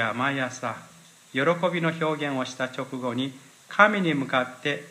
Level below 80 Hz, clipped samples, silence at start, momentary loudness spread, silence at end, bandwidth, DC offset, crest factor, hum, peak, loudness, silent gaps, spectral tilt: -76 dBFS; under 0.1%; 0 s; 12 LU; 0 s; 15.5 kHz; under 0.1%; 24 dB; none; -2 dBFS; -26 LUFS; none; -5 dB/octave